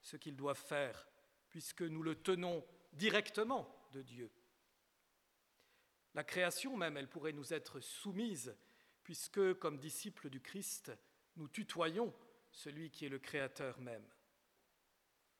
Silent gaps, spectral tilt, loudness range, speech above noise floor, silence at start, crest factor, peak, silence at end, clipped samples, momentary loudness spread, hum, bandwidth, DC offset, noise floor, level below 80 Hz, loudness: none; -4 dB/octave; 5 LU; 37 dB; 0.05 s; 26 dB; -18 dBFS; 1.35 s; under 0.1%; 17 LU; none; 18.5 kHz; under 0.1%; -80 dBFS; -86 dBFS; -43 LUFS